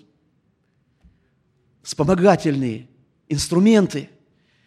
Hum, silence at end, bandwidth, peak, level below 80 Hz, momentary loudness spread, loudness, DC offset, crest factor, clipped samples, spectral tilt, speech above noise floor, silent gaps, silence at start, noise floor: none; 0.6 s; 13 kHz; -2 dBFS; -50 dBFS; 17 LU; -19 LUFS; under 0.1%; 20 dB; under 0.1%; -6 dB/octave; 48 dB; none; 1.85 s; -65 dBFS